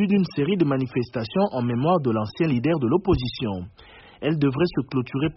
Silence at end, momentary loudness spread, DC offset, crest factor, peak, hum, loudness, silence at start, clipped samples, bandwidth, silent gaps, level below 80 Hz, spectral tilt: 0.05 s; 7 LU; under 0.1%; 14 dB; -8 dBFS; none; -23 LUFS; 0 s; under 0.1%; 5.8 kHz; none; -46 dBFS; -6.5 dB/octave